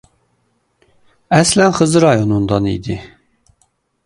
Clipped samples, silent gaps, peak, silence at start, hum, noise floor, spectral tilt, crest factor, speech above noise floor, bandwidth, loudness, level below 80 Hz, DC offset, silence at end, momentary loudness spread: under 0.1%; none; 0 dBFS; 1.3 s; none; -63 dBFS; -5 dB/octave; 16 dB; 50 dB; 11.5 kHz; -14 LUFS; -42 dBFS; under 0.1%; 1 s; 12 LU